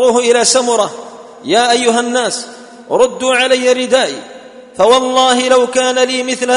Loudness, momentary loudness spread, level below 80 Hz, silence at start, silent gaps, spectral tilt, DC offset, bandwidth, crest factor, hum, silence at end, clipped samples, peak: -12 LUFS; 13 LU; -56 dBFS; 0 s; none; -1.5 dB/octave; under 0.1%; 11 kHz; 12 dB; none; 0 s; under 0.1%; 0 dBFS